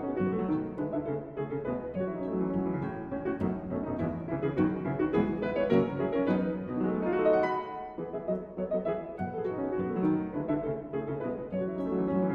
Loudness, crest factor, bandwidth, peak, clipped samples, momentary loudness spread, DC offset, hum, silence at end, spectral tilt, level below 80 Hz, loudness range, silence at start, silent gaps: -31 LUFS; 18 dB; 5.4 kHz; -12 dBFS; under 0.1%; 8 LU; under 0.1%; none; 0 s; -10 dB/octave; -56 dBFS; 4 LU; 0 s; none